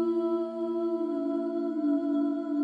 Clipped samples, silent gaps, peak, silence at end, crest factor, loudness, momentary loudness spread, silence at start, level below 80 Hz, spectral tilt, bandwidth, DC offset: under 0.1%; none; -18 dBFS; 0 s; 10 dB; -30 LUFS; 3 LU; 0 s; -88 dBFS; -8 dB/octave; 4.9 kHz; under 0.1%